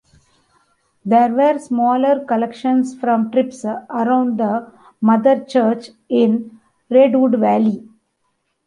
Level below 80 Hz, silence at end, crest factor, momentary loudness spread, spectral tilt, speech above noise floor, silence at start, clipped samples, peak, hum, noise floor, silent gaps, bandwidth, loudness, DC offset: -66 dBFS; 0.9 s; 14 dB; 10 LU; -7 dB/octave; 53 dB; 1.05 s; under 0.1%; -2 dBFS; none; -69 dBFS; none; 10.5 kHz; -17 LUFS; under 0.1%